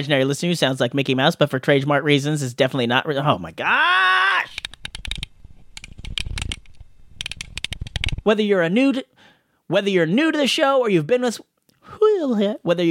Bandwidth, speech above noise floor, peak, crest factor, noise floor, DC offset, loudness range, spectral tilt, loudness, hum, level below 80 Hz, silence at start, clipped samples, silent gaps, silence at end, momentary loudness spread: 16.5 kHz; 36 dB; -2 dBFS; 20 dB; -55 dBFS; under 0.1%; 10 LU; -5 dB/octave; -20 LUFS; none; -40 dBFS; 0 s; under 0.1%; none; 0 s; 14 LU